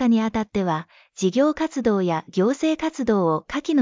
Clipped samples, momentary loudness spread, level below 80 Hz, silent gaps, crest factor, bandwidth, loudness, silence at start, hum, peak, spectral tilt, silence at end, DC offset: under 0.1%; 5 LU; -52 dBFS; none; 14 dB; 7.6 kHz; -22 LUFS; 0 s; none; -6 dBFS; -6 dB/octave; 0 s; under 0.1%